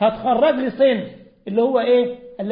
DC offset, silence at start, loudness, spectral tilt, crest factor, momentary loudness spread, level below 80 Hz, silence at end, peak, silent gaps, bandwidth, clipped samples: under 0.1%; 0 s; -18 LUFS; -10.5 dB/octave; 12 dB; 13 LU; -58 dBFS; 0 s; -6 dBFS; none; 5.2 kHz; under 0.1%